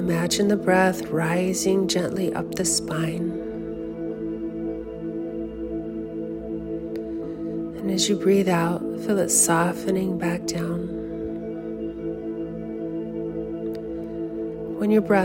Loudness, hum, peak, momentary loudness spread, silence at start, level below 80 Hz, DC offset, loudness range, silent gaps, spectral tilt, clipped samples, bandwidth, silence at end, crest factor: -25 LUFS; none; -6 dBFS; 12 LU; 0 s; -50 dBFS; under 0.1%; 9 LU; none; -4.5 dB/octave; under 0.1%; 16.5 kHz; 0 s; 18 dB